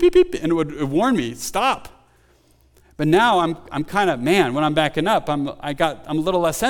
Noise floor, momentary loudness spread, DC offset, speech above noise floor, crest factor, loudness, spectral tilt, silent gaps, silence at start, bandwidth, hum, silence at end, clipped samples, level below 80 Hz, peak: -56 dBFS; 8 LU; under 0.1%; 37 dB; 16 dB; -20 LUFS; -5 dB/octave; none; 0 s; 18.5 kHz; none; 0 s; under 0.1%; -44 dBFS; -4 dBFS